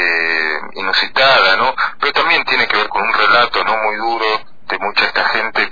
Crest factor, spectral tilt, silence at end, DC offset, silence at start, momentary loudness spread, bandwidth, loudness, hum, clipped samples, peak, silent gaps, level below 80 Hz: 14 dB; -3 dB/octave; 0 s; 3%; 0 s; 7 LU; 5 kHz; -13 LUFS; none; under 0.1%; 0 dBFS; none; -50 dBFS